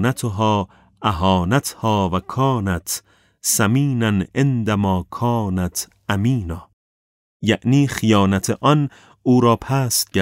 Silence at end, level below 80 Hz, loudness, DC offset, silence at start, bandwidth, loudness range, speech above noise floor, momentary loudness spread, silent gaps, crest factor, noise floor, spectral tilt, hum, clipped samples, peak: 0 s; -44 dBFS; -19 LUFS; under 0.1%; 0 s; 16.5 kHz; 3 LU; over 72 dB; 8 LU; 6.73-7.40 s; 16 dB; under -90 dBFS; -5 dB/octave; none; under 0.1%; -2 dBFS